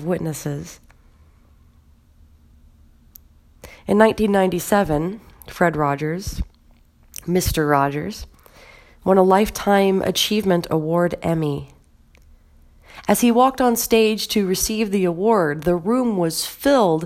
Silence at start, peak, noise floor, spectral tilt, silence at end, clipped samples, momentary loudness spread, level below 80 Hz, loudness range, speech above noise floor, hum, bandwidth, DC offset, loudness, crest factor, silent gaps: 0 s; 0 dBFS; -53 dBFS; -5 dB/octave; 0 s; under 0.1%; 15 LU; -40 dBFS; 5 LU; 34 dB; none; 16.5 kHz; under 0.1%; -19 LUFS; 20 dB; none